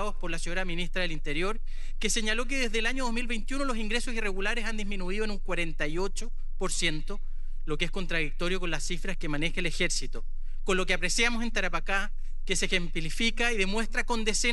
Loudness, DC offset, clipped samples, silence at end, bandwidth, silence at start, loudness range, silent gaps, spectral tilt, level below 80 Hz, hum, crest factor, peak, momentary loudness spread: -30 LUFS; under 0.1%; under 0.1%; 0 s; 11.5 kHz; 0 s; 4 LU; none; -3 dB/octave; -30 dBFS; none; 16 dB; -10 dBFS; 11 LU